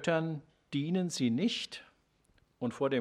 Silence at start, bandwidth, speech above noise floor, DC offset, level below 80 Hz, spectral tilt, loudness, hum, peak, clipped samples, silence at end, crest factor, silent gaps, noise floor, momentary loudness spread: 0 s; 13 kHz; 38 dB; under 0.1%; -74 dBFS; -5.5 dB/octave; -34 LUFS; none; -16 dBFS; under 0.1%; 0 s; 18 dB; none; -70 dBFS; 11 LU